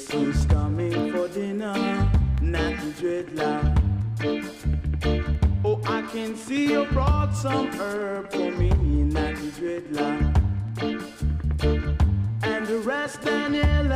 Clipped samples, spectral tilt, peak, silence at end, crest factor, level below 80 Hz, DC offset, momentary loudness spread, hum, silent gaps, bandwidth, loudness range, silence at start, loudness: under 0.1%; -7 dB/octave; -8 dBFS; 0 s; 16 dB; -28 dBFS; under 0.1%; 6 LU; none; none; 12.5 kHz; 1 LU; 0 s; -25 LUFS